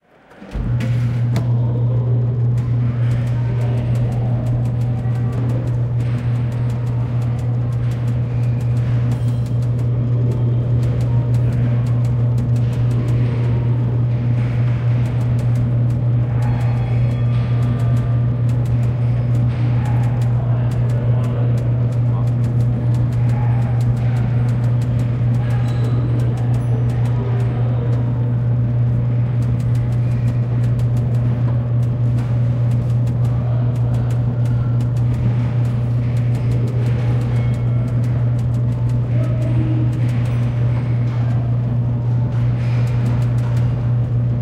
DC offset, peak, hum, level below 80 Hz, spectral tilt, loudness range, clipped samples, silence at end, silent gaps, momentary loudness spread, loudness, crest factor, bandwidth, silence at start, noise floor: under 0.1%; -6 dBFS; none; -32 dBFS; -9.5 dB/octave; 2 LU; under 0.1%; 0 s; none; 2 LU; -18 LUFS; 10 dB; 4.3 kHz; 0.35 s; -41 dBFS